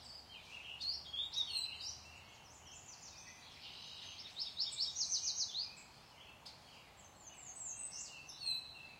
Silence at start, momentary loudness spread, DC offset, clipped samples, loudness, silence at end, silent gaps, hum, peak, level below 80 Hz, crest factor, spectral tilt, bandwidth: 0 s; 19 LU; under 0.1%; under 0.1%; -41 LUFS; 0 s; none; none; -26 dBFS; -74 dBFS; 22 dB; 1 dB/octave; 16 kHz